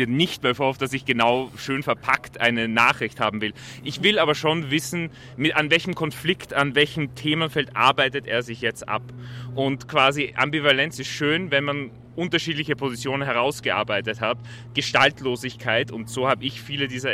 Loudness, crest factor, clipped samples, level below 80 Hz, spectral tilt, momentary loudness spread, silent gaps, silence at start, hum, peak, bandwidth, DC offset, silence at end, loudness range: -22 LUFS; 20 dB; under 0.1%; -56 dBFS; -4.5 dB/octave; 10 LU; none; 0 s; none; -4 dBFS; 16 kHz; under 0.1%; 0 s; 2 LU